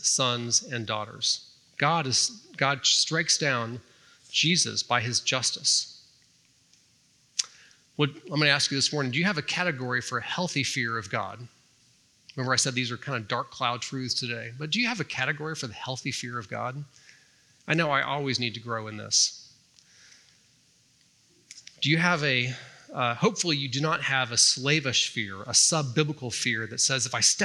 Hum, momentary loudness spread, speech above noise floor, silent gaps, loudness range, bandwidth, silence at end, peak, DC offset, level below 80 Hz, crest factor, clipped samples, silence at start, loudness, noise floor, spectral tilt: none; 12 LU; 36 dB; none; 7 LU; 13 kHz; 0 s; -4 dBFS; under 0.1%; -76 dBFS; 26 dB; under 0.1%; 0 s; -26 LUFS; -64 dBFS; -2.5 dB/octave